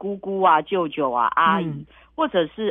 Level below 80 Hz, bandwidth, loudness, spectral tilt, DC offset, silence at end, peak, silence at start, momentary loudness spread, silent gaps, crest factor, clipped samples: -58 dBFS; 3.9 kHz; -21 LUFS; -8.5 dB/octave; under 0.1%; 0 s; -4 dBFS; 0 s; 12 LU; none; 16 dB; under 0.1%